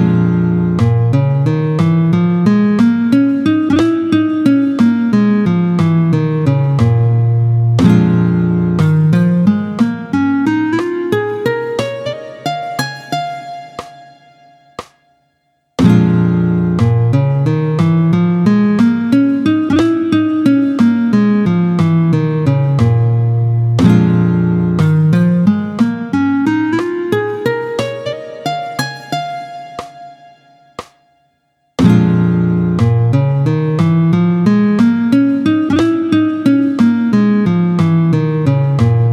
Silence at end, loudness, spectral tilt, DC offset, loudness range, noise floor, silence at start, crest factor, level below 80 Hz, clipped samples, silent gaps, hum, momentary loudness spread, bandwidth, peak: 0 s; -13 LUFS; -8.5 dB/octave; under 0.1%; 8 LU; -62 dBFS; 0 s; 12 dB; -46 dBFS; under 0.1%; none; none; 10 LU; 10.5 kHz; 0 dBFS